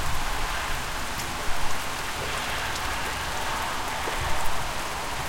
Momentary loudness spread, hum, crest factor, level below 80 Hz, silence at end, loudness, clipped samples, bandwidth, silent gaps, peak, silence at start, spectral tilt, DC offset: 2 LU; none; 16 dB; -36 dBFS; 0 s; -29 LUFS; under 0.1%; 17 kHz; none; -10 dBFS; 0 s; -2.5 dB/octave; under 0.1%